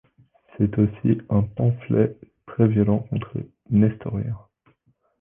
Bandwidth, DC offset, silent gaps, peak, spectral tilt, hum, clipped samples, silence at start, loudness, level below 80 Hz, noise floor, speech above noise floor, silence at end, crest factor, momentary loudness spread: 3.5 kHz; under 0.1%; none; -4 dBFS; -12.5 dB/octave; none; under 0.1%; 0.6 s; -23 LUFS; -46 dBFS; -65 dBFS; 44 dB; 0.85 s; 18 dB; 12 LU